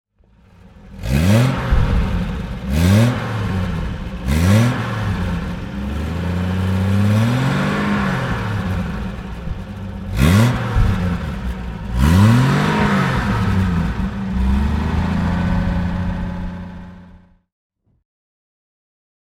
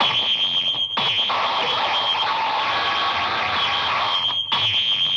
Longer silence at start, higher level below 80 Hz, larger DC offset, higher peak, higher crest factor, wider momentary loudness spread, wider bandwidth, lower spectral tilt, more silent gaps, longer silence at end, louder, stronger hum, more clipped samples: first, 0.75 s vs 0 s; first, -26 dBFS vs -60 dBFS; neither; first, 0 dBFS vs -8 dBFS; about the same, 18 dB vs 14 dB; first, 13 LU vs 3 LU; first, 16.5 kHz vs 10 kHz; first, -7 dB/octave vs -2 dB/octave; neither; first, 2.25 s vs 0 s; about the same, -18 LUFS vs -19 LUFS; neither; neither